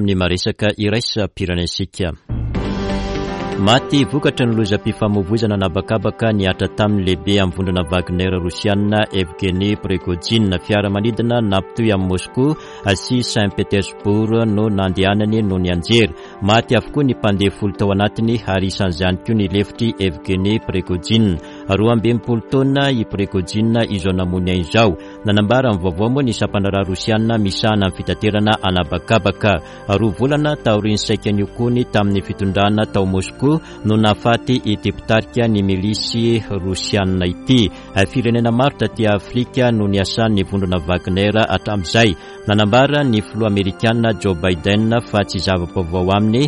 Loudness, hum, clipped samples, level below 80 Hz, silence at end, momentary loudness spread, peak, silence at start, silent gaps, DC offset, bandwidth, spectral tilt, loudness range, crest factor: -17 LUFS; none; under 0.1%; -38 dBFS; 0 s; 5 LU; -2 dBFS; 0 s; none; under 0.1%; 11.5 kHz; -6 dB/octave; 2 LU; 14 dB